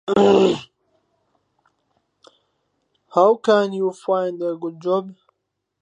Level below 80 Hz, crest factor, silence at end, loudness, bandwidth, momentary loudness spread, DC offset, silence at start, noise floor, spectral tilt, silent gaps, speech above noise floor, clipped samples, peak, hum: -62 dBFS; 20 dB; 0.7 s; -19 LUFS; 10 kHz; 12 LU; under 0.1%; 0.05 s; -77 dBFS; -6 dB/octave; none; 59 dB; under 0.1%; -2 dBFS; none